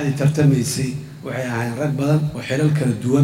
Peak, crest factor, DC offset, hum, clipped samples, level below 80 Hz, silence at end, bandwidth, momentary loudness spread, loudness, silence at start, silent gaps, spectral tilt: -4 dBFS; 14 dB; under 0.1%; none; under 0.1%; -50 dBFS; 0 s; 14.5 kHz; 10 LU; -20 LUFS; 0 s; none; -6.5 dB/octave